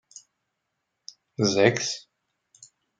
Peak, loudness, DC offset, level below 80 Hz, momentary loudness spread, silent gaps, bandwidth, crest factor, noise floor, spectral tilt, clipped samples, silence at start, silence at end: -2 dBFS; -24 LUFS; under 0.1%; -72 dBFS; 26 LU; none; 9.4 kHz; 26 dB; -80 dBFS; -4 dB/octave; under 0.1%; 1.4 s; 1 s